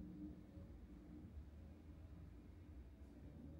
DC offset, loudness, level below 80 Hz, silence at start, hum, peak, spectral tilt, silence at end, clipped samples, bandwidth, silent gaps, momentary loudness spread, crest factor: under 0.1%; -60 LUFS; -62 dBFS; 0 s; none; -42 dBFS; -8.5 dB/octave; 0 s; under 0.1%; 15.5 kHz; none; 5 LU; 14 dB